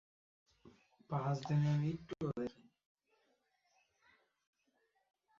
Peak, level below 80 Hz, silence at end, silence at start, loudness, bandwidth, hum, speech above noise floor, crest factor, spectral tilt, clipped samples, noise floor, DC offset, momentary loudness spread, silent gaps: -26 dBFS; -74 dBFS; 2.9 s; 0.65 s; -39 LUFS; 7.4 kHz; none; 43 dB; 18 dB; -8 dB/octave; under 0.1%; -80 dBFS; under 0.1%; 9 LU; none